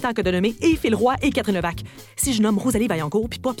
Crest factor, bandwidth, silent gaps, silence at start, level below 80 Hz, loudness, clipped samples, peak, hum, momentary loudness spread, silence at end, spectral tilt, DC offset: 14 dB; 17.5 kHz; none; 0 s; -40 dBFS; -21 LUFS; under 0.1%; -6 dBFS; none; 7 LU; 0 s; -5 dB/octave; under 0.1%